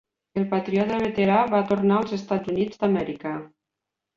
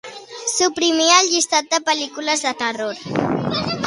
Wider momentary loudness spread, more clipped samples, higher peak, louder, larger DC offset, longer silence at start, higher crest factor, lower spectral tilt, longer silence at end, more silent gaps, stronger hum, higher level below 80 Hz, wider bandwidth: about the same, 11 LU vs 11 LU; neither; second, -6 dBFS vs 0 dBFS; second, -24 LUFS vs -18 LUFS; neither; first, 0.35 s vs 0.05 s; about the same, 18 dB vs 20 dB; first, -8 dB/octave vs -2 dB/octave; first, 0.7 s vs 0 s; neither; neither; about the same, -58 dBFS vs -56 dBFS; second, 7.2 kHz vs 11.5 kHz